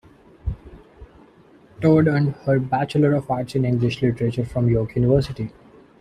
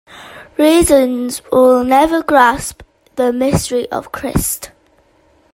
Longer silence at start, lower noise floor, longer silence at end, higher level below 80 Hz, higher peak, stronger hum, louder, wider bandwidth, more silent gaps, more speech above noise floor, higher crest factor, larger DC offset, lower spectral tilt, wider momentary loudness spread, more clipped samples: first, 0.45 s vs 0.15 s; about the same, -51 dBFS vs -53 dBFS; second, 0.5 s vs 0.85 s; second, -42 dBFS vs -36 dBFS; second, -4 dBFS vs 0 dBFS; neither; second, -21 LUFS vs -13 LUFS; second, 10.5 kHz vs 16.5 kHz; neither; second, 31 dB vs 40 dB; about the same, 18 dB vs 14 dB; neither; first, -8.5 dB/octave vs -4.5 dB/octave; about the same, 15 LU vs 15 LU; neither